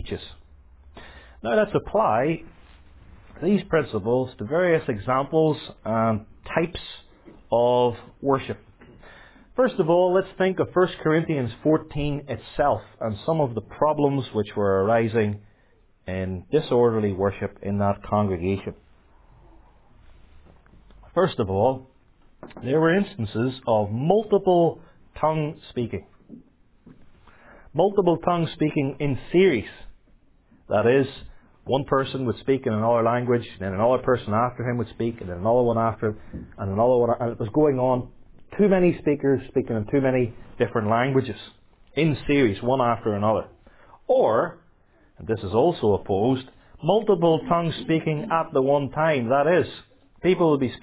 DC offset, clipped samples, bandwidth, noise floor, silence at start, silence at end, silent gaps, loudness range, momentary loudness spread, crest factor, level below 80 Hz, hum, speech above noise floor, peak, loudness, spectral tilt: under 0.1%; under 0.1%; 4 kHz; -58 dBFS; 0 s; 0.05 s; none; 4 LU; 11 LU; 20 dB; -48 dBFS; none; 36 dB; -4 dBFS; -23 LUFS; -11 dB/octave